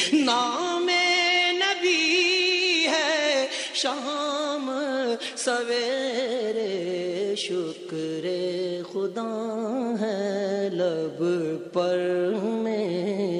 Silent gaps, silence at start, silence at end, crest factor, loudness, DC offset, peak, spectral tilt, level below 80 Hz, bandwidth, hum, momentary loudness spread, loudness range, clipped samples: none; 0 s; 0 s; 16 dB; -25 LUFS; under 0.1%; -10 dBFS; -3 dB/octave; -80 dBFS; 11.5 kHz; none; 9 LU; 8 LU; under 0.1%